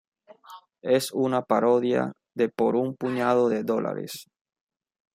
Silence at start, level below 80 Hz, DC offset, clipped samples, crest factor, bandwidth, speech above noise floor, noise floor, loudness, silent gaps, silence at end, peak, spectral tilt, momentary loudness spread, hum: 0.5 s; -72 dBFS; under 0.1%; under 0.1%; 18 dB; 16 kHz; 25 dB; -49 dBFS; -25 LUFS; none; 0.9 s; -8 dBFS; -5.5 dB/octave; 11 LU; none